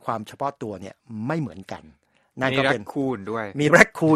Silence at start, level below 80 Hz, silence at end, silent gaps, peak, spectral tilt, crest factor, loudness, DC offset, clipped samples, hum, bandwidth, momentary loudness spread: 0.05 s; -56 dBFS; 0 s; none; 0 dBFS; -5.5 dB/octave; 24 dB; -22 LUFS; under 0.1%; under 0.1%; none; 14 kHz; 23 LU